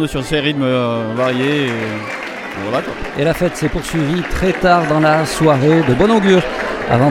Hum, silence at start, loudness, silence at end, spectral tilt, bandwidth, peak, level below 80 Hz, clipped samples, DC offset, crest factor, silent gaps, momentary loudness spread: none; 0 s; -15 LUFS; 0 s; -6 dB/octave; 16.5 kHz; 0 dBFS; -34 dBFS; under 0.1%; under 0.1%; 14 dB; none; 9 LU